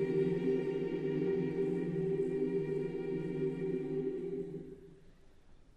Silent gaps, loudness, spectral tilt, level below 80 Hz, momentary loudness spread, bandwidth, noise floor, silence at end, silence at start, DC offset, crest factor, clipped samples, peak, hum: none; -36 LUFS; -9.5 dB/octave; -62 dBFS; 8 LU; 7.8 kHz; -58 dBFS; 0.15 s; 0 s; under 0.1%; 14 dB; under 0.1%; -22 dBFS; none